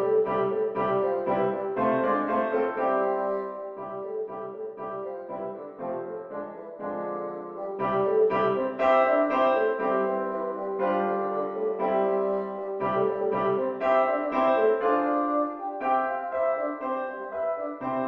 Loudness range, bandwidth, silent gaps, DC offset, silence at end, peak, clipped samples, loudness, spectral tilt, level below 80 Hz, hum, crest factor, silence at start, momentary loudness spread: 10 LU; 6 kHz; none; under 0.1%; 0 s; -10 dBFS; under 0.1%; -27 LUFS; -8 dB/octave; -66 dBFS; none; 16 dB; 0 s; 12 LU